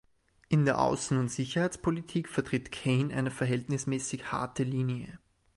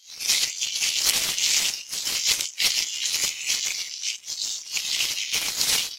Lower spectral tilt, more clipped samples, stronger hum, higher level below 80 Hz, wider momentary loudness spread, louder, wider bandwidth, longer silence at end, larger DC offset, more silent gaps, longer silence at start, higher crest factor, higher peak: first, -6 dB/octave vs 2.5 dB/octave; neither; neither; about the same, -58 dBFS vs -60 dBFS; about the same, 7 LU vs 8 LU; second, -31 LUFS vs -23 LUFS; second, 11.5 kHz vs 16 kHz; first, 0.4 s vs 0 s; neither; neither; first, 0.5 s vs 0.05 s; about the same, 20 dB vs 24 dB; second, -12 dBFS vs -2 dBFS